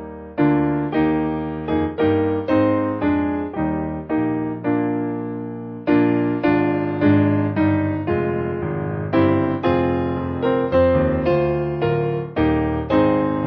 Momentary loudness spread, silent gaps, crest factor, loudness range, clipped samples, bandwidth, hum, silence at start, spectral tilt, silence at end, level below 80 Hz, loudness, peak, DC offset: 7 LU; none; 14 dB; 2 LU; under 0.1%; 5.2 kHz; none; 0 s; -10.5 dB/octave; 0 s; -38 dBFS; -20 LUFS; -4 dBFS; under 0.1%